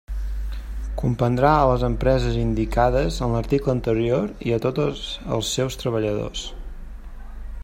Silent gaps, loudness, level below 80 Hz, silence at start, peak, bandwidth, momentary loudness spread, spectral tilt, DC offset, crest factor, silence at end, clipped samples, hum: none; -22 LUFS; -30 dBFS; 0.1 s; -4 dBFS; 16 kHz; 20 LU; -6 dB/octave; under 0.1%; 18 dB; 0 s; under 0.1%; none